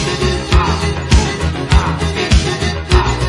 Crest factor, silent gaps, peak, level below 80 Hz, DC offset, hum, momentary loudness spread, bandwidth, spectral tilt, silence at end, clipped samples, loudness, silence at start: 14 dB; none; 0 dBFS; -18 dBFS; under 0.1%; none; 4 LU; 11.5 kHz; -5 dB/octave; 0 s; under 0.1%; -15 LUFS; 0 s